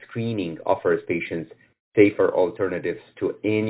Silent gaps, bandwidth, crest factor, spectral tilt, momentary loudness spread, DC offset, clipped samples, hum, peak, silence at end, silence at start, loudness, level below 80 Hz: 1.80-1.92 s; 4 kHz; 20 dB; -11 dB/octave; 12 LU; under 0.1%; under 0.1%; none; -2 dBFS; 0 s; 0.1 s; -23 LUFS; -58 dBFS